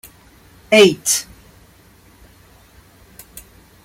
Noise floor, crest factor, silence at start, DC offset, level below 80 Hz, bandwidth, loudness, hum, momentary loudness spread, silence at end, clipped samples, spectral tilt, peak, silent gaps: -49 dBFS; 20 dB; 0.7 s; under 0.1%; -52 dBFS; 16.5 kHz; -14 LUFS; none; 28 LU; 2.6 s; under 0.1%; -2.5 dB/octave; -2 dBFS; none